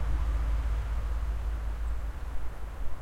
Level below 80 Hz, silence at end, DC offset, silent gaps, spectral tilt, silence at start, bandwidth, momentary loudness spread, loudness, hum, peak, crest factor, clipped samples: -32 dBFS; 0 s; under 0.1%; none; -6.5 dB/octave; 0 s; 9 kHz; 9 LU; -35 LUFS; none; -18 dBFS; 10 dB; under 0.1%